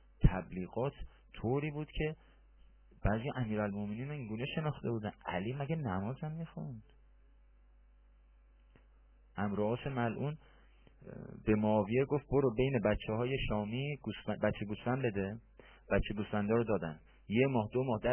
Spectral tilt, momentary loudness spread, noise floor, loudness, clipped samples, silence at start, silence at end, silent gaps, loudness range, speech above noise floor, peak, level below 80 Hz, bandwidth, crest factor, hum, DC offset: -6.5 dB/octave; 12 LU; -63 dBFS; -36 LUFS; under 0.1%; 0.2 s; 0 s; none; 9 LU; 28 dB; -10 dBFS; -48 dBFS; 3.3 kHz; 26 dB; none; under 0.1%